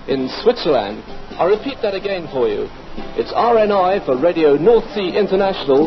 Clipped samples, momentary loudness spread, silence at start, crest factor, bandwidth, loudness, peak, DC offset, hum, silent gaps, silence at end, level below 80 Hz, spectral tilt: under 0.1%; 13 LU; 0 s; 14 dB; 6.2 kHz; -17 LUFS; -2 dBFS; under 0.1%; none; none; 0 s; -38 dBFS; -7 dB/octave